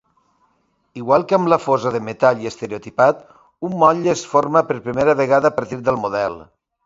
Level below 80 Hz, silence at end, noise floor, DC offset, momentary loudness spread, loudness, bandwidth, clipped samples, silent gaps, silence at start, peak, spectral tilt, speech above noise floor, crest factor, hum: -56 dBFS; 0.45 s; -65 dBFS; under 0.1%; 13 LU; -18 LUFS; 7.8 kHz; under 0.1%; none; 0.95 s; 0 dBFS; -6 dB/octave; 47 dB; 18 dB; none